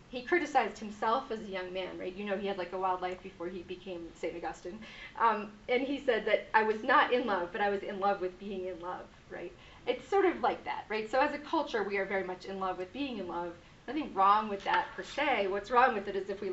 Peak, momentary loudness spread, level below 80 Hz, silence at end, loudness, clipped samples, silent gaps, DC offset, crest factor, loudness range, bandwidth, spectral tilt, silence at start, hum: -12 dBFS; 15 LU; -62 dBFS; 0 s; -32 LUFS; under 0.1%; none; under 0.1%; 20 dB; 6 LU; 8 kHz; -2 dB/octave; 0 s; none